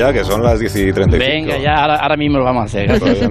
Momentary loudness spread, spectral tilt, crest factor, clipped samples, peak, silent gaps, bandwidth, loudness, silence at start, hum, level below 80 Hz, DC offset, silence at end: 3 LU; -6 dB/octave; 12 dB; under 0.1%; -2 dBFS; none; 14 kHz; -14 LUFS; 0 s; none; -26 dBFS; under 0.1%; 0 s